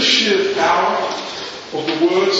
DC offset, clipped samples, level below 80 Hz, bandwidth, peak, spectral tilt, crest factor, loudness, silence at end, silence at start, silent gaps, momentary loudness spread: under 0.1%; under 0.1%; -60 dBFS; 8 kHz; 0 dBFS; -2.5 dB/octave; 16 dB; -17 LUFS; 0 s; 0 s; none; 13 LU